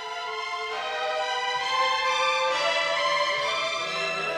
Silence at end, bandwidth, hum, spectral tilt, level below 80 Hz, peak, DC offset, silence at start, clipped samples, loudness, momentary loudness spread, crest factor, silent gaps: 0 s; 16 kHz; none; -0.5 dB/octave; -66 dBFS; -12 dBFS; under 0.1%; 0 s; under 0.1%; -25 LUFS; 7 LU; 14 dB; none